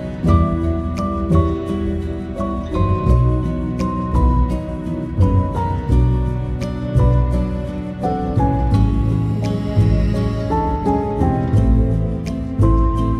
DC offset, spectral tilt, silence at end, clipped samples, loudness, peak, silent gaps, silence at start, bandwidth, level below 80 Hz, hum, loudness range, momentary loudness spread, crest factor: under 0.1%; -9 dB/octave; 0 s; under 0.1%; -19 LUFS; -2 dBFS; none; 0 s; 9.8 kHz; -22 dBFS; none; 1 LU; 8 LU; 16 dB